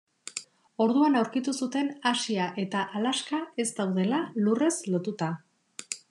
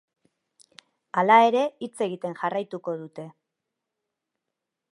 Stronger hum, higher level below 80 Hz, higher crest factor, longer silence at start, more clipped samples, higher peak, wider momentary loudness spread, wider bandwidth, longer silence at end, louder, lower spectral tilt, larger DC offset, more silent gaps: neither; about the same, -88 dBFS vs -84 dBFS; about the same, 18 dB vs 22 dB; second, 0.25 s vs 1.15 s; neither; second, -10 dBFS vs -4 dBFS; second, 15 LU vs 21 LU; about the same, 12 kHz vs 11.5 kHz; second, 0.15 s vs 1.6 s; second, -28 LUFS vs -24 LUFS; about the same, -4.5 dB/octave vs -5.5 dB/octave; neither; neither